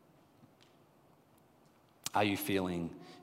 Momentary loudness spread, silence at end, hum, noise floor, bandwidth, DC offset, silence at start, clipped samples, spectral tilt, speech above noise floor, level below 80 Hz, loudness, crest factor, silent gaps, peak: 12 LU; 0 s; none; -66 dBFS; 16 kHz; under 0.1%; 2.05 s; under 0.1%; -4.5 dB/octave; 31 dB; -76 dBFS; -35 LUFS; 24 dB; none; -16 dBFS